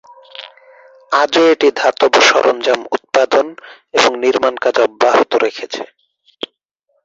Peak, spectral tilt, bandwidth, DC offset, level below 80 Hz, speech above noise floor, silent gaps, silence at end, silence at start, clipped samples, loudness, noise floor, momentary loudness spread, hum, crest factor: 0 dBFS; -1.5 dB/octave; 8 kHz; under 0.1%; -62 dBFS; 53 dB; none; 1.2 s; 0.4 s; under 0.1%; -13 LUFS; -66 dBFS; 19 LU; none; 14 dB